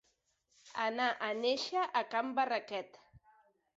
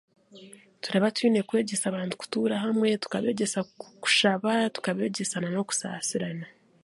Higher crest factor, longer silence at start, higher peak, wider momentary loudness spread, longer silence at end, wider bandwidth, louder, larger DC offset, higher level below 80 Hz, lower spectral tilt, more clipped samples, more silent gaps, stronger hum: about the same, 18 dB vs 18 dB; first, 0.65 s vs 0.35 s; second, -20 dBFS vs -10 dBFS; about the same, 10 LU vs 9 LU; first, 0.8 s vs 0.35 s; second, 8 kHz vs 11.5 kHz; second, -35 LUFS vs -27 LUFS; neither; about the same, -80 dBFS vs -76 dBFS; second, 0 dB/octave vs -4 dB/octave; neither; neither; neither